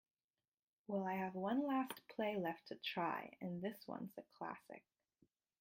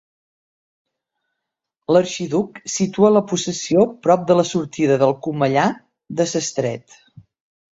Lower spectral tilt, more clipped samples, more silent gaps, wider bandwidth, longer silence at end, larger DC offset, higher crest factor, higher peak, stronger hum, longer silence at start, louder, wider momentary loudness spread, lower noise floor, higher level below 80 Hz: first, -6.5 dB/octave vs -5 dB/octave; neither; neither; first, 16.5 kHz vs 8 kHz; second, 0.8 s vs 0.95 s; neither; about the same, 16 dB vs 18 dB; second, -28 dBFS vs -2 dBFS; neither; second, 0.9 s vs 1.9 s; second, -44 LUFS vs -19 LUFS; about the same, 12 LU vs 10 LU; first, under -90 dBFS vs -81 dBFS; second, -88 dBFS vs -62 dBFS